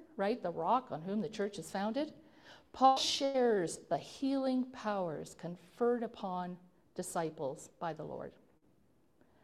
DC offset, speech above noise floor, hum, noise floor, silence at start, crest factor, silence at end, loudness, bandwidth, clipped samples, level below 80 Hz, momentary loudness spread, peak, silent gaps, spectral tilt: under 0.1%; 36 dB; none; -72 dBFS; 0 s; 22 dB; 1.15 s; -36 LUFS; 16 kHz; under 0.1%; -74 dBFS; 15 LU; -14 dBFS; none; -4.5 dB/octave